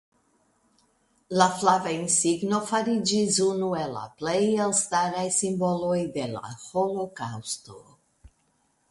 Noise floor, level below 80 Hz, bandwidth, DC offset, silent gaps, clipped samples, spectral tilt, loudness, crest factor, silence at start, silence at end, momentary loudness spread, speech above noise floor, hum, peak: -69 dBFS; -64 dBFS; 11.5 kHz; under 0.1%; none; under 0.1%; -3.5 dB/octave; -25 LUFS; 20 dB; 1.3 s; 0.65 s; 11 LU; 44 dB; none; -6 dBFS